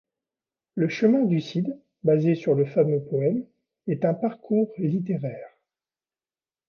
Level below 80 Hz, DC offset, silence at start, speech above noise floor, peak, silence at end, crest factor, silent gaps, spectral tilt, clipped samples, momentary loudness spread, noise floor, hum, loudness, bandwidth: -72 dBFS; under 0.1%; 0.75 s; over 67 dB; -8 dBFS; 1.2 s; 16 dB; none; -9 dB/octave; under 0.1%; 10 LU; under -90 dBFS; none; -24 LUFS; 6.8 kHz